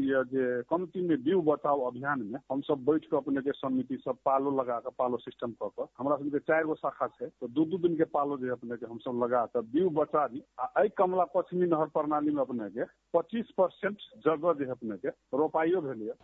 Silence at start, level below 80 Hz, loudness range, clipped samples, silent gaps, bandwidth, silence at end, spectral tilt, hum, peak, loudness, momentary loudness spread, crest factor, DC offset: 0 s; -74 dBFS; 3 LU; under 0.1%; none; 4 kHz; 0.1 s; -9.5 dB/octave; none; -12 dBFS; -31 LUFS; 8 LU; 18 dB; under 0.1%